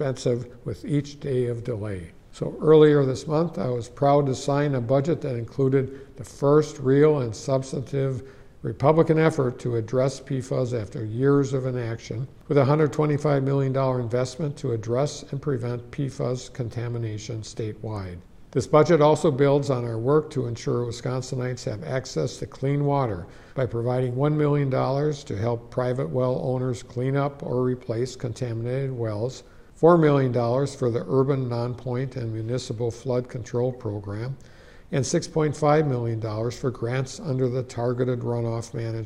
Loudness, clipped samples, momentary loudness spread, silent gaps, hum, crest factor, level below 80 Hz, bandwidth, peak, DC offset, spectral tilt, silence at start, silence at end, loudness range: -24 LUFS; under 0.1%; 12 LU; none; none; 18 dB; -52 dBFS; 11 kHz; -4 dBFS; under 0.1%; -7 dB/octave; 0 s; 0 s; 6 LU